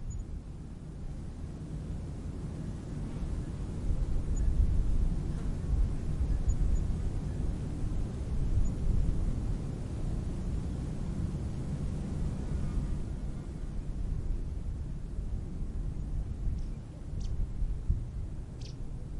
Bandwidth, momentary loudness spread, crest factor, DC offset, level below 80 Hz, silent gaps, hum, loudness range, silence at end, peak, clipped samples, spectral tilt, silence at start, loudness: 11 kHz; 10 LU; 18 dB; under 0.1%; -34 dBFS; none; none; 6 LU; 0 s; -14 dBFS; under 0.1%; -8 dB/octave; 0 s; -37 LUFS